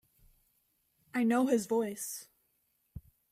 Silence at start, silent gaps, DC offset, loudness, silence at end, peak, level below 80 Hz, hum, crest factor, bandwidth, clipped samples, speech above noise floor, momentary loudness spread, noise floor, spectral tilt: 1.15 s; none; under 0.1%; -32 LUFS; 0.3 s; -16 dBFS; -66 dBFS; none; 18 dB; 16 kHz; under 0.1%; 46 dB; 24 LU; -76 dBFS; -4.5 dB/octave